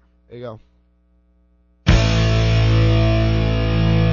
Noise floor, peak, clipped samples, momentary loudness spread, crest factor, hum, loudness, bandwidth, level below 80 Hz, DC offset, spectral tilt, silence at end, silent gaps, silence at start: -57 dBFS; -2 dBFS; under 0.1%; 19 LU; 16 dB; 60 Hz at -45 dBFS; -17 LUFS; 7.2 kHz; -24 dBFS; under 0.1%; -6.5 dB/octave; 0 s; none; 0.3 s